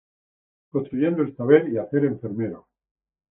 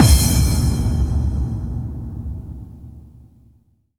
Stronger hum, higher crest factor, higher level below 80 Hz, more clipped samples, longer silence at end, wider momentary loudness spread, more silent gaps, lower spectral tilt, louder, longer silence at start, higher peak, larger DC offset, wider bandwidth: neither; about the same, 22 dB vs 18 dB; second, -66 dBFS vs -22 dBFS; neither; second, 0.75 s vs 1 s; second, 12 LU vs 22 LU; neither; first, -8 dB/octave vs -5 dB/octave; second, -23 LUFS vs -20 LUFS; first, 0.75 s vs 0 s; second, -4 dBFS vs 0 dBFS; second, under 0.1% vs 0.2%; second, 3.6 kHz vs 18.5 kHz